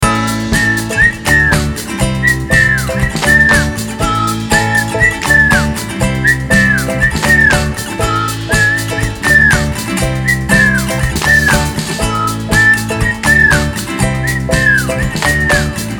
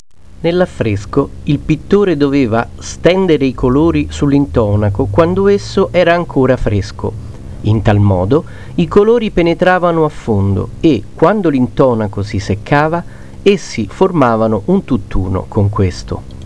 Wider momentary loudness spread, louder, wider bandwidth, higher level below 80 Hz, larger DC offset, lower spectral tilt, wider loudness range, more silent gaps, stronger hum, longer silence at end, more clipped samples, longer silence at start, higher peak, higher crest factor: about the same, 8 LU vs 8 LU; about the same, -11 LUFS vs -13 LUFS; first, over 20 kHz vs 11 kHz; first, -24 dBFS vs -30 dBFS; second, under 0.1% vs 2%; second, -4 dB/octave vs -7.5 dB/octave; about the same, 1 LU vs 2 LU; neither; neither; about the same, 0 s vs 0 s; second, under 0.1% vs 0.1%; second, 0 s vs 0.4 s; about the same, 0 dBFS vs 0 dBFS; about the same, 12 dB vs 12 dB